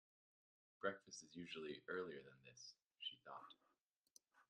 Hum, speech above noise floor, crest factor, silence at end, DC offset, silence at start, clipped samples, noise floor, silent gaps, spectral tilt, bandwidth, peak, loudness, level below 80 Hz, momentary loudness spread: none; 34 dB; 26 dB; 0.05 s; under 0.1%; 0.8 s; under 0.1%; -87 dBFS; 3.83-4.03 s, 4.11-4.15 s; -3 dB/octave; 10.5 kHz; -30 dBFS; -53 LUFS; under -90 dBFS; 12 LU